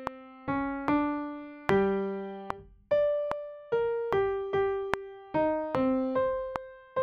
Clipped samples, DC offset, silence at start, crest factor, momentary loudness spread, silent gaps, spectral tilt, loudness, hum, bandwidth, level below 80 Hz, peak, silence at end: under 0.1%; under 0.1%; 0 s; 24 dB; 12 LU; none; -7.5 dB/octave; -30 LUFS; none; 8 kHz; -58 dBFS; -6 dBFS; 0 s